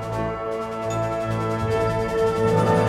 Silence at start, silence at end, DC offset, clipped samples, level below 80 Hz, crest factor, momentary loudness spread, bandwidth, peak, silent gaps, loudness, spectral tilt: 0 s; 0 s; under 0.1%; under 0.1%; -42 dBFS; 16 dB; 7 LU; 14 kHz; -8 dBFS; none; -23 LUFS; -7 dB/octave